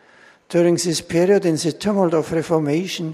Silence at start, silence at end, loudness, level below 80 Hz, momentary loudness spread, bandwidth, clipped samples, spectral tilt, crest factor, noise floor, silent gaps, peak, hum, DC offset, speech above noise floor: 0.5 s; 0 s; -19 LUFS; -54 dBFS; 5 LU; 14 kHz; under 0.1%; -5.5 dB/octave; 16 dB; -50 dBFS; none; -4 dBFS; none; under 0.1%; 32 dB